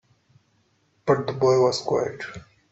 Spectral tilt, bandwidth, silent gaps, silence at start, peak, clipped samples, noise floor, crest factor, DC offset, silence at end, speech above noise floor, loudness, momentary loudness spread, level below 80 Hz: -5.5 dB/octave; 8.2 kHz; none; 1.05 s; -6 dBFS; under 0.1%; -66 dBFS; 20 dB; under 0.1%; 0.3 s; 44 dB; -23 LUFS; 17 LU; -62 dBFS